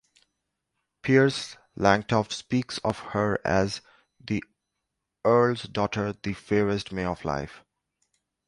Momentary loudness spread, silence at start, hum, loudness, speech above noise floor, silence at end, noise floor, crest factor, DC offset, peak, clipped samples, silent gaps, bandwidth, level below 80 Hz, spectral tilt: 12 LU; 1.05 s; none; -26 LUFS; 57 dB; 0.9 s; -83 dBFS; 24 dB; under 0.1%; -4 dBFS; under 0.1%; none; 11.5 kHz; -52 dBFS; -6 dB/octave